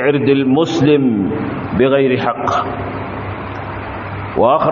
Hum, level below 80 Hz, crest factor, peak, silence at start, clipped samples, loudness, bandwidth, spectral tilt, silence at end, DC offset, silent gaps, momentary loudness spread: none; -42 dBFS; 14 dB; 0 dBFS; 0 s; under 0.1%; -16 LUFS; 7.4 kHz; -7.5 dB/octave; 0 s; under 0.1%; none; 12 LU